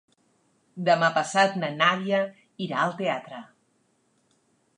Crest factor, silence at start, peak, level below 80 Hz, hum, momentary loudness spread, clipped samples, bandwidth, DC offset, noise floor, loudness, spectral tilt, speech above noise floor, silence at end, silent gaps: 22 dB; 0.75 s; -6 dBFS; -82 dBFS; none; 15 LU; under 0.1%; 11 kHz; under 0.1%; -69 dBFS; -25 LUFS; -4.5 dB/octave; 44 dB; 1.35 s; none